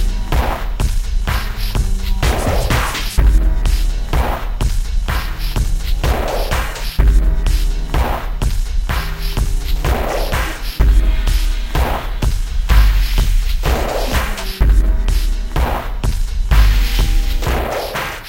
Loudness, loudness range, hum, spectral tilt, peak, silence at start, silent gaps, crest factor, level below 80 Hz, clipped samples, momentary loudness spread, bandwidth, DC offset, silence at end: -19 LUFS; 2 LU; none; -5 dB/octave; 0 dBFS; 0 s; none; 14 dB; -16 dBFS; under 0.1%; 6 LU; 16.5 kHz; under 0.1%; 0 s